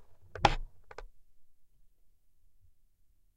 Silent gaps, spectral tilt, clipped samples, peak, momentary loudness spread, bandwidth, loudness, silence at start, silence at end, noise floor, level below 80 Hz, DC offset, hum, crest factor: none; -4.5 dB/octave; under 0.1%; -6 dBFS; 22 LU; 9.8 kHz; -31 LUFS; 0 s; 1.75 s; -66 dBFS; -46 dBFS; under 0.1%; none; 32 dB